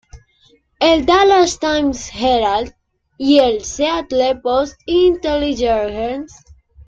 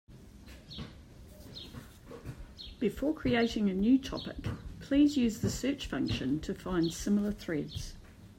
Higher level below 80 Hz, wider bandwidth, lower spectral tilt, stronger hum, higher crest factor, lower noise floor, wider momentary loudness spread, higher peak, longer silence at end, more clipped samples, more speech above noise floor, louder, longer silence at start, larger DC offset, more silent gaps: first, -40 dBFS vs -50 dBFS; second, 8.8 kHz vs 16 kHz; second, -3.5 dB/octave vs -5.5 dB/octave; neither; about the same, 16 dB vs 16 dB; about the same, -55 dBFS vs -52 dBFS; second, 10 LU vs 20 LU; first, -2 dBFS vs -16 dBFS; about the same, 0.05 s vs 0.05 s; neither; first, 40 dB vs 21 dB; first, -16 LUFS vs -32 LUFS; about the same, 0.15 s vs 0.1 s; neither; neither